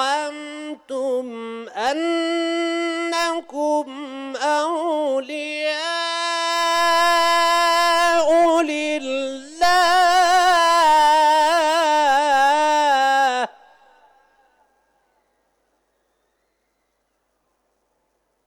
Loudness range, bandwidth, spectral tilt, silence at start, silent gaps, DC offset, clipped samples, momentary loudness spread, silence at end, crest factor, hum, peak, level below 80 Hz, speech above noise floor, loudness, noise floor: 8 LU; 19 kHz; -0.5 dB/octave; 0 s; none; under 0.1%; under 0.1%; 12 LU; 4.95 s; 12 dB; none; -8 dBFS; -60 dBFS; 49 dB; -18 LUFS; -70 dBFS